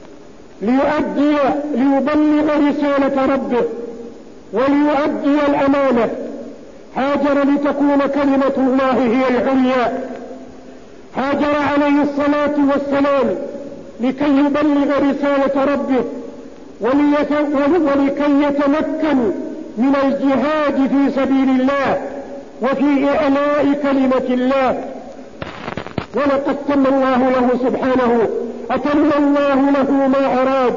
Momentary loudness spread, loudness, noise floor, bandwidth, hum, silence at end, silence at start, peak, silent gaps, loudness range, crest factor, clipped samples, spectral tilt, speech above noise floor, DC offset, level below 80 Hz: 12 LU; -16 LUFS; -40 dBFS; 7.4 kHz; none; 0 s; 0 s; -4 dBFS; none; 2 LU; 12 dB; under 0.1%; -6.5 dB/octave; 25 dB; 0.8%; -50 dBFS